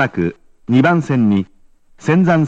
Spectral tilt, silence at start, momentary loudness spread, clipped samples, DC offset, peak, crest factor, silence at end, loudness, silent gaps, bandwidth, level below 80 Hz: -8 dB/octave; 0 s; 13 LU; under 0.1%; under 0.1%; 0 dBFS; 14 dB; 0 s; -16 LUFS; none; 8 kHz; -50 dBFS